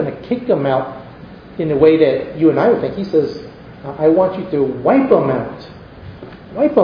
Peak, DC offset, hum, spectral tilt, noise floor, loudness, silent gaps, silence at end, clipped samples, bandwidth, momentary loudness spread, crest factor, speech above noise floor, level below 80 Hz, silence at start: 0 dBFS; under 0.1%; none; -9.5 dB/octave; -36 dBFS; -15 LUFS; none; 0 s; under 0.1%; 5.2 kHz; 23 LU; 16 dB; 22 dB; -48 dBFS; 0 s